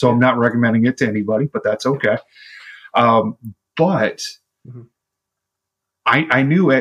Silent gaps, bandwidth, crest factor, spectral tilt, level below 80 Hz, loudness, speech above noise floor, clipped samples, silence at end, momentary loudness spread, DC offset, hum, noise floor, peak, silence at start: none; 11.5 kHz; 16 dB; -6.5 dB/octave; -60 dBFS; -17 LUFS; 65 dB; under 0.1%; 0 s; 15 LU; under 0.1%; none; -81 dBFS; -2 dBFS; 0 s